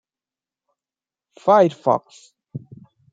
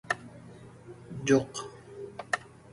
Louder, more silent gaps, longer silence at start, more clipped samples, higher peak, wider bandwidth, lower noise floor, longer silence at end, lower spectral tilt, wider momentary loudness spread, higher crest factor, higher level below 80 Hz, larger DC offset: first, -18 LUFS vs -31 LUFS; neither; first, 1.45 s vs 0.05 s; neither; first, -2 dBFS vs -12 dBFS; second, 7.8 kHz vs 11.5 kHz; first, under -90 dBFS vs -49 dBFS; first, 0.55 s vs 0.25 s; first, -7 dB/octave vs -5 dB/octave; about the same, 22 LU vs 23 LU; about the same, 20 dB vs 22 dB; second, -72 dBFS vs -64 dBFS; neither